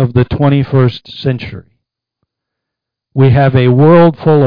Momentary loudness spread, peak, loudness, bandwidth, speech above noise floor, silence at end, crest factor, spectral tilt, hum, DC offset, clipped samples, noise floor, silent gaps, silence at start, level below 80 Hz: 13 LU; 0 dBFS; -10 LUFS; 5.2 kHz; 70 dB; 0 s; 10 dB; -10.5 dB/octave; none; under 0.1%; under 0.1%; -79 dBFS; none; 0 s; -36 dBFS